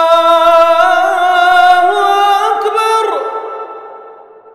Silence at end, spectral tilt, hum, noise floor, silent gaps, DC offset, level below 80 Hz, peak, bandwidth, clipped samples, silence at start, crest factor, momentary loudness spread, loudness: 0.3 s; -1 dB/octave; none; -36 dBFS; none; under 0.1%; -54 dBFS; 0 dBFS; 14 kHz; 0.2%; 0 s; 10 dB; 15 LU; -9 LUFS